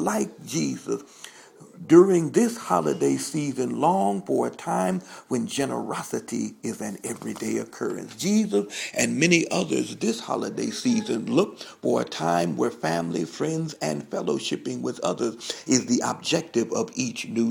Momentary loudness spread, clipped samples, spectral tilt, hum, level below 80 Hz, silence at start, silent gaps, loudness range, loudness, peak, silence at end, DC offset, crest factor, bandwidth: 10 LU; under 0.1%; -4.5 dB/octave; none; -68 dBFS; 0 s; none; 6 LU; -25 LUFS; -2 dBFS; 0 s; under 0.1%; 22 dB; 17.5 kHz